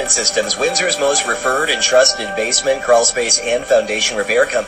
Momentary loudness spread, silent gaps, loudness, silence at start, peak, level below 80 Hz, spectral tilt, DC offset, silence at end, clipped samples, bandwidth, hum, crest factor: 4 LU; none; -14 LUFS; 0 s; 0 dBFS; -46 dBFS; 0 dB/octave; under 0.1%; 0 s; under 0.1%; 15.5 kHz; none; 16 dB